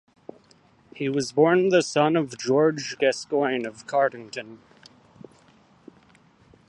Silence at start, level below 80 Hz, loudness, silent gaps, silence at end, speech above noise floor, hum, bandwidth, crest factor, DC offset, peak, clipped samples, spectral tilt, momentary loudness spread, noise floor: 0.95 s; -70 dBFS; -23 LUFS; none; 2.15 s; 35 dB; none; 11.5 kHz; 20 dB; under 0.1%; -6 dBFS; under 0.1%; -5 dB/octave; 13 LU; -58 dBFS